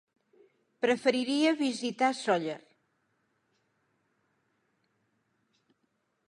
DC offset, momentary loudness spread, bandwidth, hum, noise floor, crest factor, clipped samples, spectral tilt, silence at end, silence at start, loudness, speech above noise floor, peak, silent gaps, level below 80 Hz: under 0.1%; 6 LU; 11.5 kHz; none; -77 dBFS; 22 dB; under 0.1%; -4 dB/octave; 3.7 s; 0.8 s; -29 LUFS; 49 dB; -12 dBFS; none; -86 dBFS